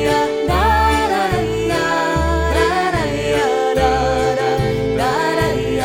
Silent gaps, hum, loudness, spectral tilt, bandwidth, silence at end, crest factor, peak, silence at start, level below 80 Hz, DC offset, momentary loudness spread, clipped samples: none; none; -17 LUFS; -5 dB/octave; 17.5 kHz; 0 s; 14 dB; -4 dBFS; 0 s; -26 dBFS; under 0.1%; 3 LU; under 0.1%